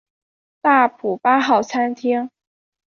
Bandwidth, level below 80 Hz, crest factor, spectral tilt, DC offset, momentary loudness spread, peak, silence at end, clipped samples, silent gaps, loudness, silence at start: 7.2 kHz; -68 dBFS; 16 dB; -4.5 dB/octave; under 0.1%; 7 LU; -2 dBFS; 0.7 s; under 0.1%; none; -18 LUFS; 0.65 s